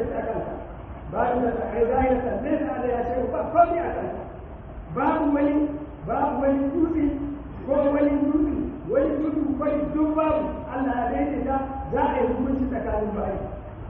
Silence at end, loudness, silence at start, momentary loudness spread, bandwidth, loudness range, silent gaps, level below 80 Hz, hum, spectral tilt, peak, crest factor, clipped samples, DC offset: 0 s; -25 LUFS; 0 s; 11 LU; 3.8 kHz; 2 LU; none; -40 dBFS; none; -7.5 dB/octave; -6 dBFS; 18 dB; under 0.1%; under 0.1%